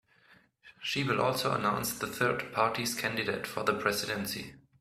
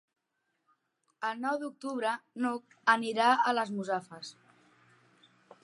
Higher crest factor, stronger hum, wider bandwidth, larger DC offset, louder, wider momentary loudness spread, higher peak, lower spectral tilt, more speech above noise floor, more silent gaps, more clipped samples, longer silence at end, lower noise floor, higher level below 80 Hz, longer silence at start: about the same, 22 dB vs 24 dB; neither; first, 16 kHz vs 11.5 kHz; neither; about the same, -31 LUFS vs -31 LUFS; second, 6 LU vs 12 LU; about the same, -12 dBFS vs -10 dBFS; about the same, -3.5 dB/octave vs -4 dB/octave; second, 32 dB vs 50 dB; neither; neither; second, 0.2 s vs 1.35 s; second, -63 dBFS vs -81 dBFS; first, -64 dBFS vs -90 dBFS; second, 0.65 s vs 1.2 s